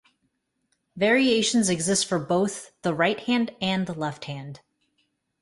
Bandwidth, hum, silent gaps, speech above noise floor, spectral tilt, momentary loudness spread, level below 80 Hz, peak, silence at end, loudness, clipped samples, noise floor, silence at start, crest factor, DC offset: 11.5 kHz; none; none; 50 dB; -4 dB/octave; 12 LU; -64 dBFS; -8 dBFS; 0.85 s; -24 LUFS; under 0.1%; -74 dBFS; 0.95 s; 18 dB; under 0.1%